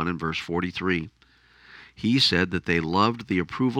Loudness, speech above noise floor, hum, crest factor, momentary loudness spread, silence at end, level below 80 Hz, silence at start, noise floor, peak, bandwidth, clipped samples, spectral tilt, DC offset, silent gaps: -24 LUFS; 32 dB; none; 20 dB; 9 LU; 0 s; -52 dBFS; 0 s; -56 dBFS; -6 dBFS; 14 kHz; under 0.1%; -5.5 dB/octave; under 0.1%; none